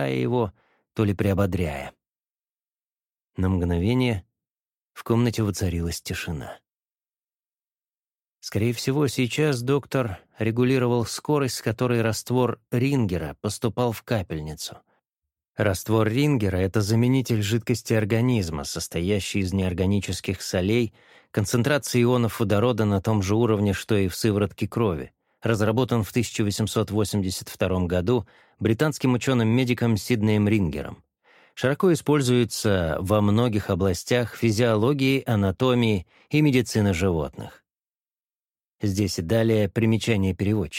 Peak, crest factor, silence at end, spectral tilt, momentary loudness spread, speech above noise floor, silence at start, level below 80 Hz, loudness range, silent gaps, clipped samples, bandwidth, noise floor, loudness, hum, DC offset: -6 dBFS; 18 dB; 0 s; -6 dB/octave; 9 LU; over 67 dB; 0 s; -48 dBFS; 6 LU; 2.30-2.34 s, 3.24-3.28 s, 4.51-4.55 s, 15.49-15.53 s, 37.95-37.99 s, 38.36-38.40 s; under 0.1%; 16.5 kHz; under -90 dBFS; -24 LUFS; none; under 0.1%